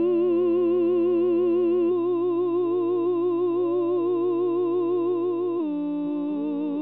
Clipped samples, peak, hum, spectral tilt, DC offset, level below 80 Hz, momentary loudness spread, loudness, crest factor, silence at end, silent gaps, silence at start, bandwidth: under 0.1%; -14 dBFS; none; -7.5 dB/octave; 0.2%; -86 dBFS; 6 LU; -24 LUFS; 8 dB; 0 s; none; 0 s; 4 kHz